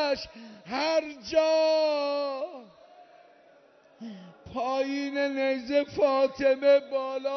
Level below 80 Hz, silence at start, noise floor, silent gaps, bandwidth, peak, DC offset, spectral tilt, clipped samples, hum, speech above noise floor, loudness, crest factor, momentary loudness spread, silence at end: -66 dBFS; 0 s; -58 dBFS; none; 6.4 kHz; -12 dBFS; under 0.1%; -4 dB/octave; under 0.1%; none; 31 dB; -27 LUFS; 16 dB; 20 LU; 0 s